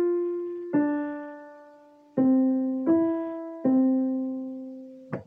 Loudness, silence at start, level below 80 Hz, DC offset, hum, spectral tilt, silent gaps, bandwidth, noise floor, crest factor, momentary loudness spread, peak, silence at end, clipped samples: -26 LUFS; 0 s; -78 dBFS; under 0.1%; none; -11 dB/octave; none; 2.8 kHz; -53 dBFS; 14 dB; 16 LU; -12 dBFS; 0.05 s; under 0.1%